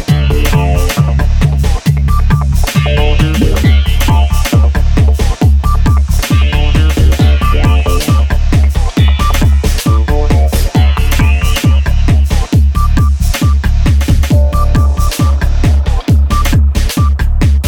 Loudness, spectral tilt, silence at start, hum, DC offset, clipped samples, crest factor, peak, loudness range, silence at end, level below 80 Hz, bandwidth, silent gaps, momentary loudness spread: -11 LUFS; -6 dB/octave; 0 s; none; 0.3%; under 0.1%; 8 dB; 0 dBFS; 1 LU; 0 s; -10 dBFS; 17.5 kHz; none; 2 LU